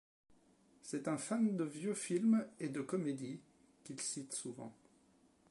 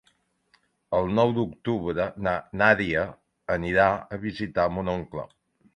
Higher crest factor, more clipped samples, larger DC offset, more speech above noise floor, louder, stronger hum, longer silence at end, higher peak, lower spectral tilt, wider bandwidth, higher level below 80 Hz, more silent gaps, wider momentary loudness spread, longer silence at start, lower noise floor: second, 16 dB vs 22 dB; neither; neither; second, 32 dB vs 43 dB; second, -39 LUFS vs -25 LUFS; neither; first, 0.8 s vs 0.5 s; second, -24 dBFS vs -4 dBFS; second, -5 dB/octave vs -7.5 dB/octave; first, 11.5 kHz vs 9.4 kHz; second, -86 dBFS vs -50 dBFS; neither; first, 18 LU vs 13 LU; about the same, 0.85 s vs 0.9 s; about the same, -70 dBFS vs -68 dBFS